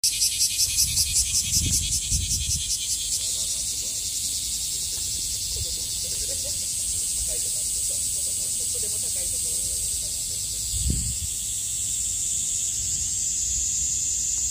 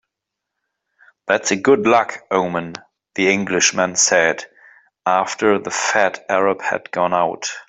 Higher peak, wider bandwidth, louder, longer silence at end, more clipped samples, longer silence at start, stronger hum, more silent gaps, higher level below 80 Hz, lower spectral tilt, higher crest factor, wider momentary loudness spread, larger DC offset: second, -6 dBFS vs -2 dBFS; first, 16 kHz vs 8.4 kHz; second, -23 LUFS vs -17 LUFS; about the same, 0 s vs 0.05 s; neither; second, 0.05 s vs 1.25 s; neither; neither; first, -40 dBFS vs -62 dBFS; second, -0.5 dB/octave vs -2.5 dB/octave; about the same, 20 dB vs 18 dB; second, 5 LU vs 12 LU; neither